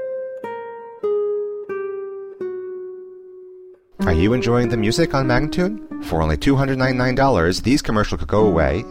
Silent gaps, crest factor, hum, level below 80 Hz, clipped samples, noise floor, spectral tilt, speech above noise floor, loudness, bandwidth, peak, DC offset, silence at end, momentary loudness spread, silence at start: none; 16 dB; none; -32 dBFS; under 0.1%; -43 dBFS; -6.5 dB/octave; 25 dB; -20 LUFS; 16 kHz; -4 dBFS; under 0.1%; 0 s; 16 LU; 0 s